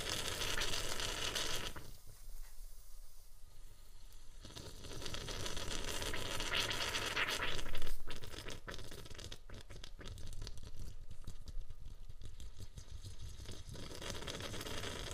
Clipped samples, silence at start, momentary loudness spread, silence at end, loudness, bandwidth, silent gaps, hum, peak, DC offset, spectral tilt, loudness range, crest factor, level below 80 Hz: under 0.1%; 0 s; 21 LU; 0 s; -42 LUFS; 15.5 kHz; none; none; -20 dBFS; under 0.1%; -2 dB/octave; 14 LU; 20 dB; -46 dBFS